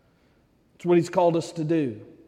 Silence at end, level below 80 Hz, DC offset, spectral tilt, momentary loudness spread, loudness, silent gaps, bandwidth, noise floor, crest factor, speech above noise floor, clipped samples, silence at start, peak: 0.25 s; -68 dBFS; under 0.1%; -7 dB/octave; 9 LU; -24 LUFS; none; 10.5 kHz; -62 dBFS; 16 dB; 39 dB; under 0.1%; 0.85 s; -8 dBFS